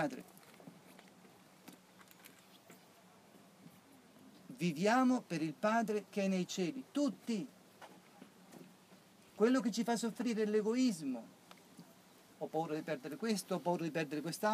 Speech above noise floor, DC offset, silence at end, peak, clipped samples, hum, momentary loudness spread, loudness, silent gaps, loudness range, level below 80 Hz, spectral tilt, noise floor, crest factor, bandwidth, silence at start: 27 dB; under 0.1%; 0 s; -20 dBFS; under 0.1%; none; 26 LU; -37 LUFS; none; 5 LU; under -90 dBFS; -5.5 dB/octave; -63 dBFS; 20 dB; 15.5 kHz; 0 s